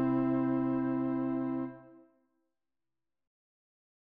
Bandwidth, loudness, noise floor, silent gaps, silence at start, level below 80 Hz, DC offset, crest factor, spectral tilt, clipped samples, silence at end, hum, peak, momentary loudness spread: 3.6 kHz; -32 LUFS; under -90 dBFS; none; 0 s; -66 dBFS; under 0.1%; 14 dB; -9 dB/octave; under 0.1%; 2.25 s; none; -20 dBFS; 7 LU